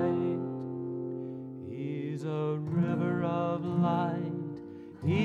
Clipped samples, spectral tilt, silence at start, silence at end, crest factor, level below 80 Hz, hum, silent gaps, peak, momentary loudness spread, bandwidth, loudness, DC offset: under 0.1%; -9 dB/octave; 0 s; 0 s; 14 dB; -70 dBFS; none; none; -18 dBFS; 12 LU; 7.2 kHz; -33 LUFS; under 0.1%